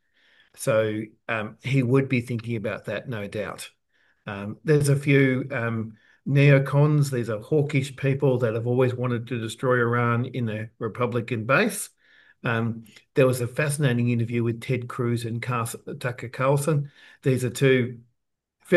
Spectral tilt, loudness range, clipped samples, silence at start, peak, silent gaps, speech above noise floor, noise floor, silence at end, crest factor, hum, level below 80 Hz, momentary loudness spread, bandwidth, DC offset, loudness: -6.5 dB/octave; 5 LU; under 0.1%; 0.6 s; -6 dBFS; none; 55 dB; -78 dBFS; 0 s; 18 dB; none; -66 dBFS; 12 LU; 12.5 kHz; under 0.1%; -24 LUFS